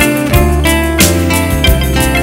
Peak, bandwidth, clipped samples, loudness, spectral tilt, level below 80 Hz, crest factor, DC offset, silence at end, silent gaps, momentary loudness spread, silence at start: 0 dBFS; 16.5 kHz; 0.3%; -10 LUFS; -4.5 dB/octave; -16 dBFS; 10 dB; under 0.1%; 0 s; none; 3 LU; 0 s